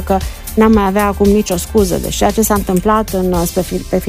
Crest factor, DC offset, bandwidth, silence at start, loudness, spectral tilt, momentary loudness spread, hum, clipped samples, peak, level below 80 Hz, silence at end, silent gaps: 12 dB; under 0.1%; 16 kHz; 0 s; -14 LUFS; -5.5 dB/octave; 7 LU; none; under 0.1%; 0 dBFS; -26 dBFS; 0 s; none